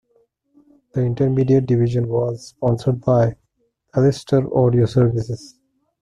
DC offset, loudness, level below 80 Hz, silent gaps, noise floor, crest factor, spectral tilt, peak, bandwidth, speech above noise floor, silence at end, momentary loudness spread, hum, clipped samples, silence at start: under 0.1%; -19 LUFS; -48 dBFS; none; -68 dBFS; 16 dB; -8.5 dB/octave; -4 dBFS; 10 kHz; 50 dB; 0.55 s; 9 LU; none; under 0.1%; 0.95 s